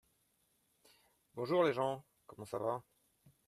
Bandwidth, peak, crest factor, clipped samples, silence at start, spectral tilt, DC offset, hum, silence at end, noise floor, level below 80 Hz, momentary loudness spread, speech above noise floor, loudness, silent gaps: 13.5 kHz; -20 dBFS; 20 dB; under 0.1%; 1.35 s; -6.5 dB/octave; under 0.1%; none; 0.65 s; -78 dBFS; -82 dBFS; 17 LU; 41 dB; -37 LUFS; none